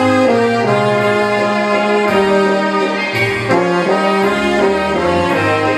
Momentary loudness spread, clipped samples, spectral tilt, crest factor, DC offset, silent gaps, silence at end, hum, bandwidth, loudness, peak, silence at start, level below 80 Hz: 2 LU; under 0.1%; -5.5 dB/octave; 12 dB; under 0.1%; none; 0 s; none; 13.5 kHz; -13 LUFS; 0 dBFS; 0 s; -44 dBFS